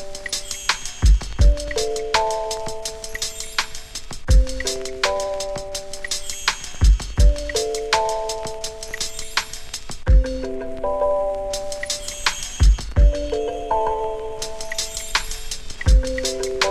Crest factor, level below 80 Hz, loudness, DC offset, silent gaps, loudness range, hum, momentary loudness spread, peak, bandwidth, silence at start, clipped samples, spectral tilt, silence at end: 18 dB; -22 dBFS; -23 LUFS; under 0.1%; none; 2 LU; none; 10 LU; -2 dBFS; 14 kHz; 0 s; under 0.1%; -3.5 dB/octave; 0 s